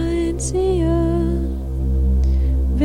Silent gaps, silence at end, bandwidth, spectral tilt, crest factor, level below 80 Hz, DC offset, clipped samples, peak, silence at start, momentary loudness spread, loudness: none; 0 s; 10.5 kHz; -7.5 dB/octave; 12 dB; -20 dBFS; under 0.1%; under 0.1%; -6 dBFS; 0 s; 5 LU; -20 LUFS